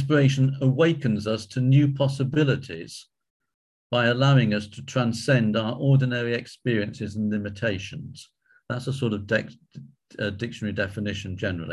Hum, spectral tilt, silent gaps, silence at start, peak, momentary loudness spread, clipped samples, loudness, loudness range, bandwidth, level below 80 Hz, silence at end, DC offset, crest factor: none; -7 dB/octave; 3.30-3.40 s, 3.54-3.90 s; 0 s; -6 dBFS; 13 LU; under 0.1%; -24 LUFS; 7 LU; 11.5 kHz; -52 dBFS; 0 s; under 0.1%; 18 dB